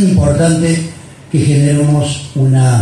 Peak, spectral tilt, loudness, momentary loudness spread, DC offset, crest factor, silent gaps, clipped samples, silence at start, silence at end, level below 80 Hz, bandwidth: 0 dBFS; -6.5 dB/octave; -12 LUFS; 7 LU; under 0.1%; 10 dB; none; under 0.1%; 0 s; 0 s; -32 dBFS; 12 kHz